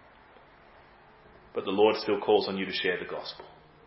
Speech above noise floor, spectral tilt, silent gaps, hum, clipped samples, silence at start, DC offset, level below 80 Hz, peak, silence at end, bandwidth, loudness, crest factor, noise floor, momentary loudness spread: 28 dB; -8 dB/octave; none; none; under 0.1%; 1.55 s; under 0.1%; -66 dBFS; -10 dBFS; 0.35 s; 5.8 kHz; -28 LUFS; 20 dB; -56 dBFS; 14 LU